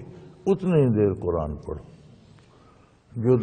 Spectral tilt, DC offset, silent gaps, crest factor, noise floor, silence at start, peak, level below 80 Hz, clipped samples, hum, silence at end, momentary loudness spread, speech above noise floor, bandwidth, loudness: -10 dB/octave; under 0.1%; none; 16 dB; -55 dBFS; 0 s; -8 dBFS; -46 dBFS; under 0.1%; none; 0 s; 18 LU; 33 dB; 9.2 kHz; -24 LUFS